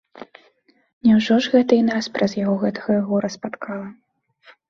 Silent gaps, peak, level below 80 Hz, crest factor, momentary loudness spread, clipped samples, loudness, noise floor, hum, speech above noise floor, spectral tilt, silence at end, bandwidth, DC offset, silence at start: 0.93-1.01 s; -4 dBFS; -62 dBFS; 18 dB; 14 LU; under 0.1%; -20 LUFS; -59 dBFS; none; 40 dB; -6 dB/octave; 0.75 s; 7.2 kHz; under 0.1%; 0.15 s